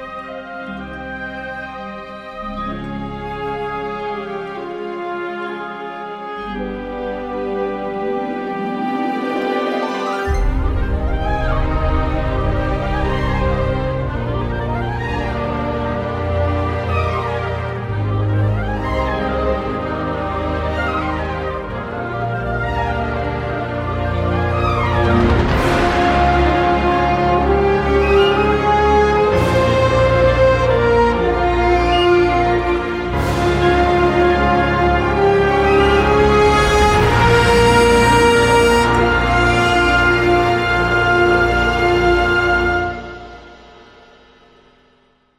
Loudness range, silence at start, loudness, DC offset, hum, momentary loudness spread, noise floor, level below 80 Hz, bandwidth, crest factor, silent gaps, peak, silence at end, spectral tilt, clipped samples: 13 LU; 0 s; -16 LUFS; under 0.1%; none; 13 LU; -56 dBFS; -26 dBFS; 15.5 kHz; 14 dB; none; -2 dBFS; 1.8 s; -6 dB/octave; under 0.1%